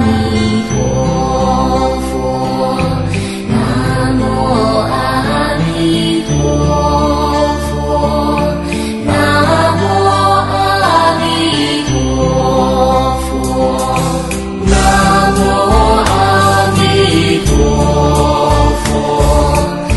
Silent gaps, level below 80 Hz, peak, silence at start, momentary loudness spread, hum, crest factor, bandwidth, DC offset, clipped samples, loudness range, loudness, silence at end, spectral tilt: none; -20 dBFS; 0 dBFS; 0 s; 6 LU; none; 12 dB; 12.5 kHz; under 0.1%; under 0.1%; 4 LU; -12 LUFS; 0 s; -5.5 dB/octave